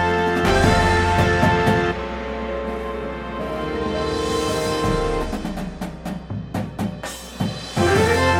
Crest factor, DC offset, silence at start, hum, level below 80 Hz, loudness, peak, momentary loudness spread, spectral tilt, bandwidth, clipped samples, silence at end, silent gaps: 18 dB; under 0.1%; 0 s; none; -34 dBFS; -21 LUFS; -2 dBFS; 13 LU; -5.5 dB/octave; 16.5 kHz; under 0.1%; 0 s; none